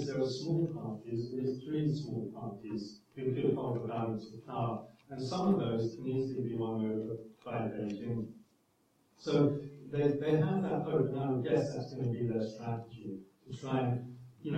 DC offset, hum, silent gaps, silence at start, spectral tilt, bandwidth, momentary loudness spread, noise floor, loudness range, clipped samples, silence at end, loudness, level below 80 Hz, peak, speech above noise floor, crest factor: under 0.1%; none; none; 0 s; -8 dB/octave; 8.6 kHz; 13 LU; -72 dBFS; 5 LU; under 0.1%; 0 s; -35 LUFS; -70 dBFS; -16 dBFS; 38 dB; 18 dB